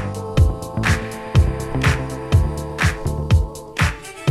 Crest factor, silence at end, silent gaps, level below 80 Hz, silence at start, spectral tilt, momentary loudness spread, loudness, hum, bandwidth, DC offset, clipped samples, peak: 16 dB; 0 s; none; -24 dBFS; 0 s; -6 dB/octave; 6 LU; -20 LUFS; none; 13.5 kHz; under 0.1%; under 0.1%; -4 dBFS